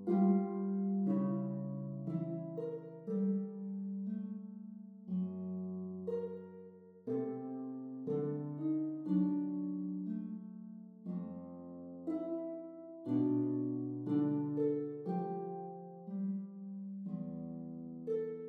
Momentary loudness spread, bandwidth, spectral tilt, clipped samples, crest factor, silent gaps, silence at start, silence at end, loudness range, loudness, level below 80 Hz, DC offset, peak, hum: 14 LU; 3.1 kHz; -12 dB/octave; under 0.1%; 18 dB; none; 0 s; 0 s; 6 LU; -39 LUFS; -84 dBFS; under 0.1%; -20 dBFS; none